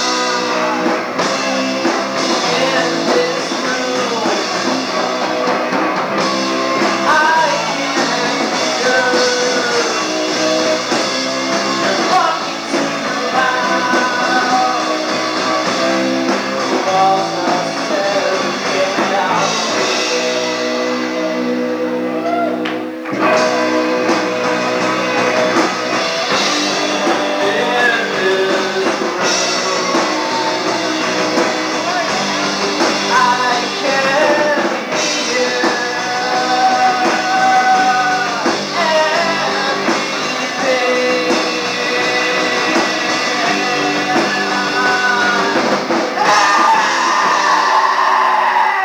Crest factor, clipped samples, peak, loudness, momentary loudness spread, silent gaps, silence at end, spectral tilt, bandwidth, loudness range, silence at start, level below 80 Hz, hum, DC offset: 14 dB; under 0.1%; 0 dBFS; -15 LUFS; 5 LU; none; 0 s; -2.5 dB/octave; over 20 kHz; 3 LU; 0 s; -68 dBFS; none; under 0.1%